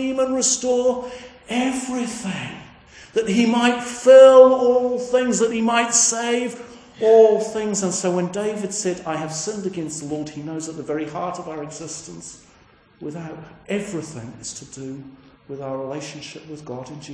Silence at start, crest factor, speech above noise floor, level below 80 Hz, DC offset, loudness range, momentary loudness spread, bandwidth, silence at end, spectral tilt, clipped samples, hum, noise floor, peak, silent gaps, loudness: 0 s; 20 dB; 33 dB; -60 dBFS; under 0.1%; 17 LU; 21 LU; 10.5 kHz; 0 s; -3.5 dB/octave; under 0.1%; none; -53 dBFS; 0 dBFS; none; -19 LUFS